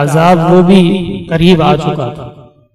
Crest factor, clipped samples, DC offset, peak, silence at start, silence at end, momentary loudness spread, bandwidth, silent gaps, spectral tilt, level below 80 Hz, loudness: 10 dB; 0.3%; under 0.1%; 0 dBFS; 0 s; 0.4 s; 12 LU; 13 kHz; none; -7 dB/octave; -34 dBFS; -9 LUFS